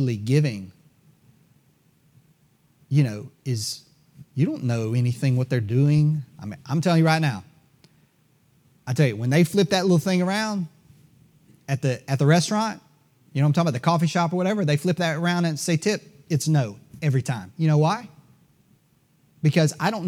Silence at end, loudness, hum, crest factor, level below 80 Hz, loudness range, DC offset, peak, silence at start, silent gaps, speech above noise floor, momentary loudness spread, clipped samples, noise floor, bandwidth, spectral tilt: 0 s; -23 LUFS; none; 18 dB; -66 dBFS; 5 LU; under 0.1%; -6 dBFS; 0 s; none; 40 dB; 11 LU; under 0.1%; -62 dBFS; 15 kHz; -6 dB/octave